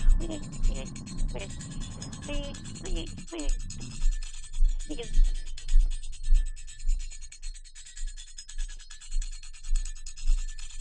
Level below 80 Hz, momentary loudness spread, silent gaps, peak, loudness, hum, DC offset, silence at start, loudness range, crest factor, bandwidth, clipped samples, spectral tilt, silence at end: -28 dBFS; 12 LU; none; -10 dBFS; -36 LUFS; none; under 0.1%; 0 s; 7 LU; 18 dB; 9.2 kHz; under 0.1%; -4.5 dB/octave; 0 s